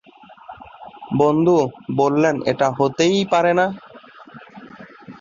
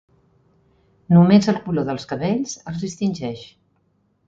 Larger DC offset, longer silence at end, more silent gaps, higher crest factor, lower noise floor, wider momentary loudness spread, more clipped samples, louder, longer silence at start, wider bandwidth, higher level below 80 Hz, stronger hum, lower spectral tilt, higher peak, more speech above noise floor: neither; second, 0.1 s vs 0.8 s; neither; about the same, 16 dB vs 18 dB; second, -43 dBFS vs -65 dBFS; first, 24 LU vs 16 LU; neither; about the same, -18 LUFS vs -20 LUFS; second, 0.5 s vs 1.1 s; about the same, 7.4 kHz vs 7.6 kHz; second, -60 dBFS vs -54 dBFS; neither; about the same, -6 dB/octave vs -7 dB/octave; about the same, -4 dBFS vs -2 dBFS; second, 26 dB vs 46 dB